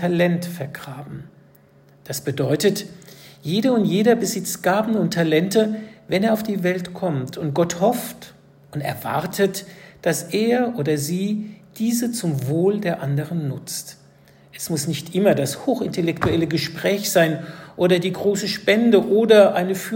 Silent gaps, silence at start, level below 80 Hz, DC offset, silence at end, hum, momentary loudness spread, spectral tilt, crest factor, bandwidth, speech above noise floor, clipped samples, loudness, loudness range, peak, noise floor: none; 0 s; -56 dBFS; under 0.1%; 0 s; none; 14 LU; -5 dB/octave; 20 dB; 16.5 kHz; 32 dB; under 0.1%; -21 LUFS; 5 LU; 0 dBFS; -52 dBFS